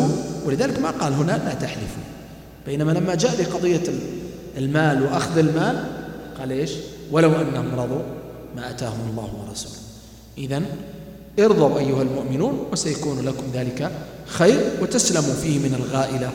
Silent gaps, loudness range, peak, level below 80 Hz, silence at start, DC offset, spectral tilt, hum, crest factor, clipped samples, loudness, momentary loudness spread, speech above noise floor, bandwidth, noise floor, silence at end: none; 4 LU; -2 dBFS; -48 dBFS; 0 s; under 0.1%; -5.5 dB/octave; none; 20 dB; under 0.1%; -22 LUFS; 16 LU; 21 dB; 16.5 kHz; -42 dBFS; 0 s